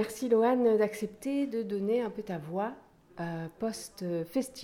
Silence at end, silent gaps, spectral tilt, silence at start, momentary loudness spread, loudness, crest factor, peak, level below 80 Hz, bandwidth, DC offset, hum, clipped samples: 0 s; none; -6 dB/octave; 0 s; 12 LU; -31 LUFS; 16 dB; -16 dBFS; -68 dBFS; 16.5 kHz; under 0.1%; none; under 0.1%